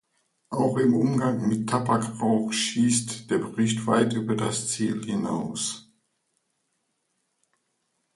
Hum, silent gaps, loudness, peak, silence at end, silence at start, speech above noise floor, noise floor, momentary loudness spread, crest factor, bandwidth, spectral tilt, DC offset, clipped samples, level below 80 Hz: none; none; -25 LUFS; -8 dBFS; 2.35 s; 0.5 s; 51 dB; -75 dBFS; 7 LU; 18 dB; 11.5 kHz; -5 dB/octave; under 0.1%; under 0.1%; -64 dBFS